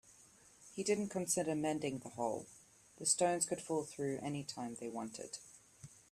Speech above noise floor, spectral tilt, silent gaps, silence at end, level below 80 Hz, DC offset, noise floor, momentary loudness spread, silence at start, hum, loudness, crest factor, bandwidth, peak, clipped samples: 26 dB; -3.5 dB/octave; none; 0.1 s; -76 dBFS; under 0.1%; -64 dBFS; 17 LU; 0.05 s; none; -38 LUFS; 22 dB; 15 kHz; -18 dBFS; under 0.1%